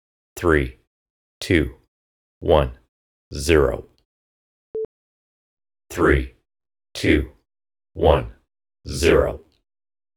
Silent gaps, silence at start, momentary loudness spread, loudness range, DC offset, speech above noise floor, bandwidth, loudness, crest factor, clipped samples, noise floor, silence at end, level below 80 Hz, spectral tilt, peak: 0.87-1.41 s, 1.88-2.41 s, 2.89-3.31 s, 4.05-4.74 s, 4.85-5.57 s; 0.35 s; 18 LU; 4 LU; under 0.1%; over 71 dB; 19 kHz; -21 LUFS; 24 dB; under 0.1%; under -90 dBFS; 0.8 s; -34 dBFS; -6 dB/octave; 0 dBFS